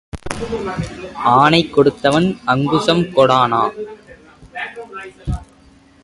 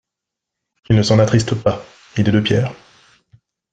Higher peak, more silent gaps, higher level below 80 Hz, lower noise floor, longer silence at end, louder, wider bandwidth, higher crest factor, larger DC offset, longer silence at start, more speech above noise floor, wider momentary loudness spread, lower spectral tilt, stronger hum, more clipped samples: about the same, 0 dBFS vs -2 dBFS; neither; first, -38 dBFS vs -46 dBFS; second, -48 dBFS vs -83 dBFS; second, 0.6 s vs 1 s; about the same, -15 LUFS vs -17 LUFS; first, 11.5 kHz vs 9.2 kHz; about the same, 18 dB vs 18 dB; neither; second, 0.15 s vs 0.9 s; second, 32 dB vs 68 dB; first, 17 LU vs 12 LU; about the same, -6 dB/octave vs -6.5 dB/octave; neither; neither